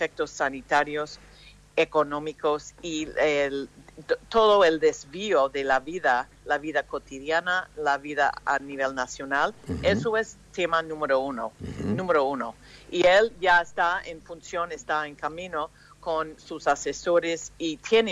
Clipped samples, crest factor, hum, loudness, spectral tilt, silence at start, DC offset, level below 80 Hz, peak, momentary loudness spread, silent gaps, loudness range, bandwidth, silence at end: under 0.1%; 16 dB; 50 Hz at -60 dBFS; -26 LUFS; -4 dB/octave; 0 s; under 0.1%; -54 dBFS; -10 dBFS; 13 LU; none; 4 LU; 11 kHz; 0 s